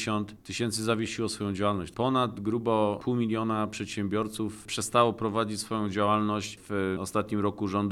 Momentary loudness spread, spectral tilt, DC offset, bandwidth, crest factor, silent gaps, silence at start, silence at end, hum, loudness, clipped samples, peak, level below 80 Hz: 7 LU; -5 dB/octave; under 0.1%; 14.5 kHz; 18 dB; none; 0 s; 0 s; none; -29 LUFS; under 0.1%; -10 dBFS; -60 dBFS